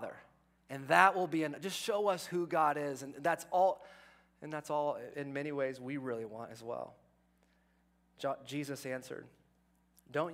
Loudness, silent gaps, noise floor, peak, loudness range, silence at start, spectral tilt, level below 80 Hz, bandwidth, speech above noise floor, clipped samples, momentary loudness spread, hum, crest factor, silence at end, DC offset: -35 LUFS; none; -72 dBFS; -10 dBFS; 12 LU; 0 s; -4.5 dB/octave; -78 dBFS; 16 kHz; 37 dB; under 0.1%; 16 LU; none; 28 dB; 0 s; under 0.1%